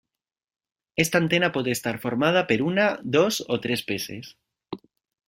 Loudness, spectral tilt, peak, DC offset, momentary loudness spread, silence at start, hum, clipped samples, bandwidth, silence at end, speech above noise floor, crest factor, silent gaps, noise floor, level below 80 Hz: -24 LUFS; -4.5 dB/octave; -4 dBFS; under 0.1%; 19 LU; 0.95 s; none; under 0.1%; 16.5 kHz; 0.5 s; 66 dB; 22 dB; none; -90 dBFS; -62 dBFS